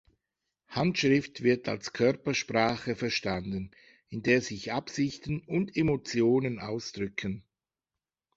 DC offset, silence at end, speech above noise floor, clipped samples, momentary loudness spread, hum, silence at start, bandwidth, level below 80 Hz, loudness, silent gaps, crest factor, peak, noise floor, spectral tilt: under 0.1%; 0.95 s; over 61 dB; under 0.1%; 10 LU; none; 0.7 s; 8 kHz; -58 dBFS; -30 LUFS; none; 22 dB; -10 dBFS; under -90 dBFS; -5.5 dB/octave